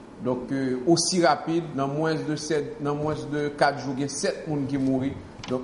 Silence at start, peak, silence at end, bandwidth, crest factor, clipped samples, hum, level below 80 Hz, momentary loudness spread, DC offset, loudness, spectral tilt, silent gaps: 0 s; -6 dBFS; 0 s; 11 kHz; 20 dB; under 0.1%; none; -56 dBFS; 8 LU; under 0.1%; -26 LUFS; -4.5 dB/octave; none